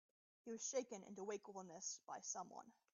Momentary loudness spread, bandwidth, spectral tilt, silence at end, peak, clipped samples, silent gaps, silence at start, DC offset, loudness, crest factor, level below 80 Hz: 11 LU; 7.4 kHz; -3.5 dB/octave; 0.2 s; -32 dBFS; under 0.1%; none; 0.45 s; under 0.1%; -50 LUFS; 20 dB; under -90 dBFS